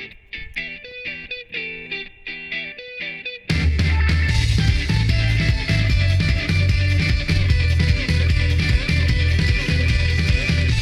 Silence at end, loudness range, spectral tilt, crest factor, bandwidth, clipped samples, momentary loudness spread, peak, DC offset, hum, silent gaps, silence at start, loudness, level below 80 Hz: 0 s; 8 LU; -5.5 dB/octave; 14 dB; 11.5 kHz; under 0.1%; 11 LU; -4 dBFS; under 0.1%; none; none; 0 s; -20 LUFS; -24 dBFS